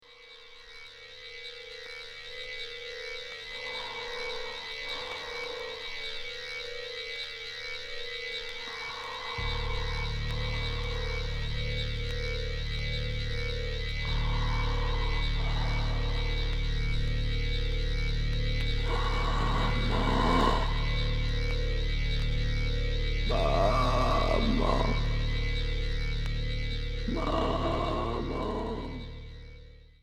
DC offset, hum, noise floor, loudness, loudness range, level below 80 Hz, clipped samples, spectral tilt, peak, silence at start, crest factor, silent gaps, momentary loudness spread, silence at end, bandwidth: under 0.1%; none; -51 dBFS; -32 LUFS; 7 LU; -32 dBFS; under 0.1%; -5.5 dB/octave; -12 dBFS; 0.1 s; 18 dB; none; 11 LU; 0.2 s; 9 kHz